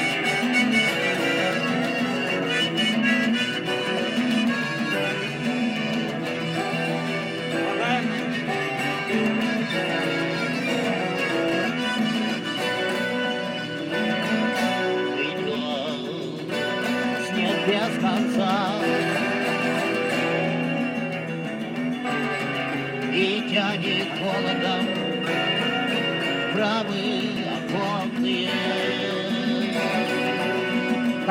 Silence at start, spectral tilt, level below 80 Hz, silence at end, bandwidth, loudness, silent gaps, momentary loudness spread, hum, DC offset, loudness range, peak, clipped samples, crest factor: 0 s; -4.5 dB/octave; -66 dBFS; 0 s; 16.5 kHz; -24 LUFS; none; 5 LU; none; under 0.1%; 3 LU; -6 dBFS; under 0.1%; 18 dB